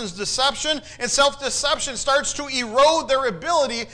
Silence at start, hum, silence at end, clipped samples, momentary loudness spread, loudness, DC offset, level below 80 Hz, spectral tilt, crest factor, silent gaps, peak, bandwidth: 0 s; none; 0 s; under 0.1%; 7 LU; -20 LUFS; under 0.1%; -46 dBFS; -1 dB/octave; 14 dB; none; -8 dBFS; 10.5 kHz